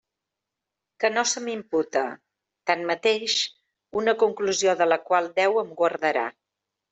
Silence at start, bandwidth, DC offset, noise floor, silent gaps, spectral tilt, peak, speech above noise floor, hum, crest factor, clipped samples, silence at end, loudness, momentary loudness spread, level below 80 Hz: 1 s; 8.2 kHz; under 0.1%; -86 dBFS; none; -2 dB/octave; -8 dBFS; 62 dB; none; 18 dB; under 0.1%; 0.6 s; -24 LUFS; 7 LU; -72 dBFS